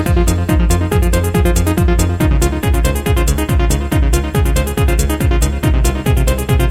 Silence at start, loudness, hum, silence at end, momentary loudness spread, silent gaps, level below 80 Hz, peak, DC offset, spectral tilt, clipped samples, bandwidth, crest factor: 0 s; -15 LUFS; none; 0 s; 1 LU; none; -16 dBFS; -2 dBFS; 0.4%; -5.5 dB/octave; under 0.1%; 16.5 kHz; 10 dB